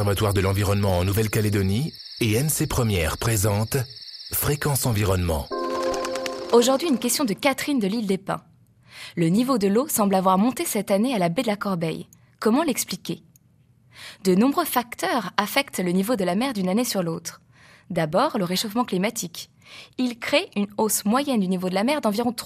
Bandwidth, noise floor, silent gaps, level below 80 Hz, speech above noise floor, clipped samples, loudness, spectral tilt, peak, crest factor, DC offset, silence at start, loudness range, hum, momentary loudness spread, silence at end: 15.5 kHz; -58 dBFS; none; -48 dBFS; 36 dB; under 0.1%; -23 LUFS; -5 dB/octave; 0 dBFS; 22 dB; under 0.1%; 0 s; 3 LU; none; 10 LU; 0 s